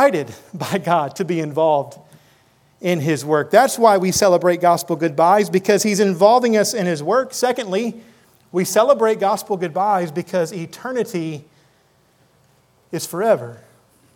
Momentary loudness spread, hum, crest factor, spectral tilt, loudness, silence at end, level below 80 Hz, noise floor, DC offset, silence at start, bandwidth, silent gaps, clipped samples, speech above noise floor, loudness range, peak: 12 LU; none; 18 dB; -4.5 dB/octave; -18 LUFS; 0.6 s; -62 dBFS; -58 dBFS; under 0.1%; 0 s; 19 kHz; none; under 0.1%; 40 dB; 10 LU; 0 dBFS